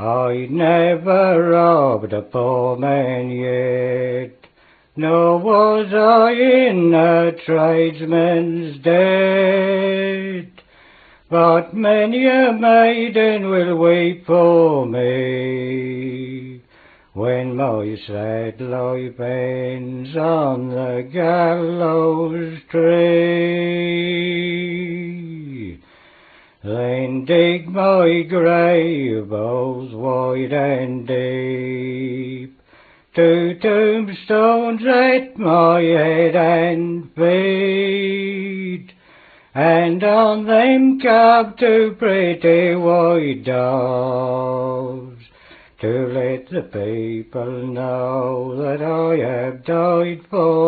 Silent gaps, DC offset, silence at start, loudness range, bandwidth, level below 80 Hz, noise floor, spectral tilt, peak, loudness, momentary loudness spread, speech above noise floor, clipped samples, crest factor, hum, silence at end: none; under 0.1%; 0 s; 9 LU; 4.7 kHz; -60 dBFS; -53 dBFS; -10.5 dB/octave; 0 dBFS; -17 LUFS; 12 LU; 37 dB; under 0.1%; 16 dB; none; 0 s